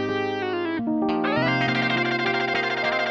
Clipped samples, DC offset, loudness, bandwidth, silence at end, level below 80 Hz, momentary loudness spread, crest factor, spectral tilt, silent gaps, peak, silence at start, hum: under 0.1%; under 0.1%; -23 LUFS; 7.6 kHz; 0 s; -60 dBFS; 5 LU; 14 dB; -6 dB/octave; none; -10 dBFS; 0 s; none